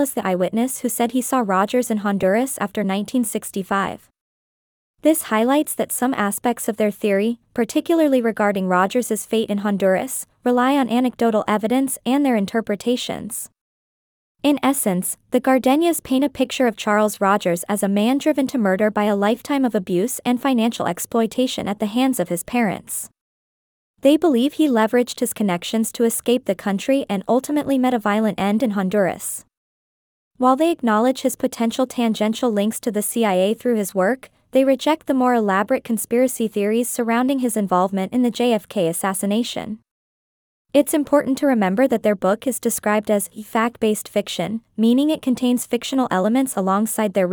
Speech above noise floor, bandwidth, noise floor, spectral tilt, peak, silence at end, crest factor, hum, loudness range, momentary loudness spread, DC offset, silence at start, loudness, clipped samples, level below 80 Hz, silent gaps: over 71 dB; over 20 kHz; under -90 dBFS; -4.5 dB/octave; -4 dBFS; 0 s; 16 dB; none; 3 LU; 5 LU; under 0.1%; 0 s; -20 LUFS; under 0.1%; -62 dBFS; 4.21-4.94 s, 13.61-14.35 s, 23.21-23.94 s, 29.57-30.31 s, 39.91-40.65 s